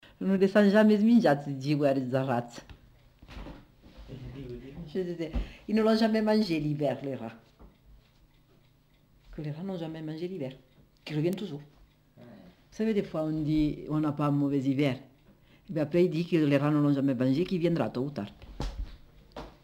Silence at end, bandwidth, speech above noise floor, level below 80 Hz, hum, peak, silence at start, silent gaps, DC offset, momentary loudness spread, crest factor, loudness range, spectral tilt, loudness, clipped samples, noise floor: 0.15 s; 15.5 kHz; 36 dB; -50 dBFS; none; -10 dBFS; 0.2 s; none; under 0.1%; 22 LU; 18 dB; 12 LU; -8 dB/octave; -28 LUFS; under 0.1%; -63 dBFS